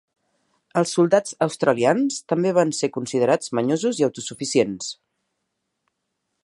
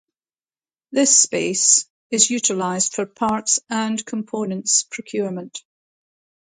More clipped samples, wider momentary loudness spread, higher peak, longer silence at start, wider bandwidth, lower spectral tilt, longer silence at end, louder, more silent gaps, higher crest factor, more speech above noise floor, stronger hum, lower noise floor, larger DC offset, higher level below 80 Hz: neither; second, 8 LU vs 13 LU; about the same, -2 dBFS vs 0 dBFS; second, 0.75 s vs 0.9 s; first, 11.5 kHz vs 9.8 kHz; first, -5 dB/octave vs -2 dB/octave; first, 1.5 s vs 0.9 s; second, -21 LUFS vs -18 LUFS; second, none vs 1.90-2.10 s; about the same, 20 dB vs 22 dB; second, 56 dB vs over 70 dB; neither; second, -77 dBFS vs under -90 dBFS; neither; about the same, -70 dBFS vs -66 dBFS